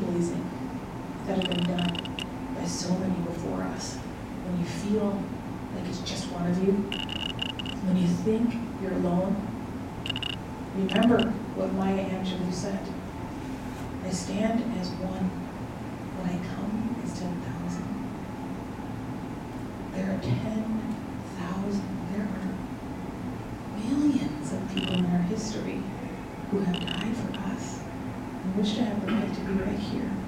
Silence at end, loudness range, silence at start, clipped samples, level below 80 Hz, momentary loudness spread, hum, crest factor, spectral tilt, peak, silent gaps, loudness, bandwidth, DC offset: 0 s; 5 LU; 0 s; under 0.1%; -48 dBFS; 10 LU; none; 20 dB; -6 dB/octave; -10 dBFS; none; -30 LUFS; 15.5 kHz; under 0.1%